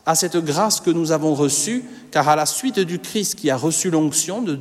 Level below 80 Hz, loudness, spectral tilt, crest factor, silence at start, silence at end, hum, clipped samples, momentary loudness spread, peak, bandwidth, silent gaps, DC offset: -66 dBFS; -19 LUFS; -3.5 dB/octave; 16 dB; 0.05 s; 0 s; none; under 0.1%; 5 LU; -4 dBFS; 16 kHz; none; under 0.1%